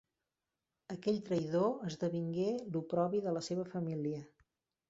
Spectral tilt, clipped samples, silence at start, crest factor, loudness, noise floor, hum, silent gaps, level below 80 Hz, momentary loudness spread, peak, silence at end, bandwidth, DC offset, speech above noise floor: -7.5 dB/octave; under 0.1%; 0.9 s; 18 dB; -37 LUFS; under -90 dBFS; none; none; -76 dBFS; 6 LU; -20 dBFS; 0.6 s; 8 kHz; under 0.1%; over 54 dB